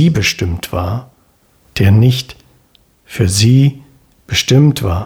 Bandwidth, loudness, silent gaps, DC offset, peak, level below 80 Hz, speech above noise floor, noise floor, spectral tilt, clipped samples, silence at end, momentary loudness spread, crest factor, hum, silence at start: 17 kHz; -13 LUFS; none; under 0.1%; 0 dBFS; -36 dBFS; 41 dB; -53 dBFS; -5.5 dB/octave; under 0.1%; 0 s; 14 LU; 14 dB; none; 0 s